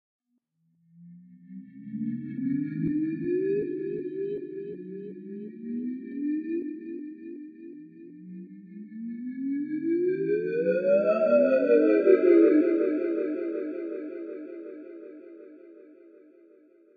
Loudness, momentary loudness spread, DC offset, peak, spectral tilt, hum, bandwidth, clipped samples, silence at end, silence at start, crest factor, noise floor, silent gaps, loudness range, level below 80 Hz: -26 LUFS; 24 LU; under 0.1%; -8 dBFS; -10.5 dB/octave; none; 4.9 kHz; under 0.1%; 1.05 s; 1 s; 20 dB; -74 dBFS; none; 14 LU; -74 dBFS